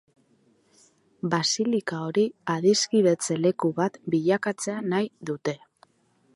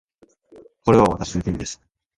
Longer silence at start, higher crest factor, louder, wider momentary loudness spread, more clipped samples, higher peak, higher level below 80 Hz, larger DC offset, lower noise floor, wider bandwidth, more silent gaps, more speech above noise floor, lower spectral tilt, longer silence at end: first, 1.25 s vs 0.85 s; about the same, 18 dB vs 20 dB; second, -25 LUFS vs -20 LUFS; second, 10 LU vs 16 LU; neither; second, -8 dBFS vs -2 dBFS; second, -72 dBFS vs -42 dBFS; neither; first, -65 dBFS vs -54 dBFS; about the same, 11.5 kHz vs 11.5 kHz; neither; first, 41 dB vs 35 dB; second, -4.5 dB/octave vs -6 dB/octave; first, 0.8 s vs 0.45 s